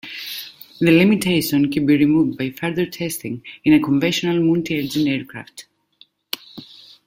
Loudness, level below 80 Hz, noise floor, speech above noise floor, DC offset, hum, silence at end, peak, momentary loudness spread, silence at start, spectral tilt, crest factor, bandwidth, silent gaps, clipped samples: -18 LUFS; -56 dBFS; -55 dBFS; 37 dB; under 0.1%; none; 0.4 s; -2 dBFS; 16 LU; 0.05 s; -5.5 dB/octave; 18 dB; 16.5 kHz; none; under 0.1%